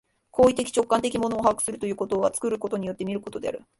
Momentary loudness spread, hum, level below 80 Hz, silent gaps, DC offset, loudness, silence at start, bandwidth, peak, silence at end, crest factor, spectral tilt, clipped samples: 10 LU; none; -56 dBFS; none; under 0.1%; -25 LUFS; 0.35 s; 12 kHz; -6 dBFS; 0.2 s; 20 dB; -4.5 dB/octave; under 0.1%